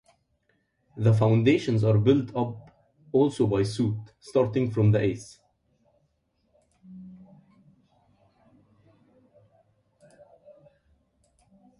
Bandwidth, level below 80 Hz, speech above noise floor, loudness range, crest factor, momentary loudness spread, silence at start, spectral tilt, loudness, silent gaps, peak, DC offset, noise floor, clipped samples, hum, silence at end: 11 kHz; -58 dBFS; 49 dB; 7 LU; 20 dB; 25 LU; 0.95 s; -8 dB/octave; -24 LUFS; none; -8 dBFS; under 0.1%; -72 dBFS; under 0.1%; none; 4.65 s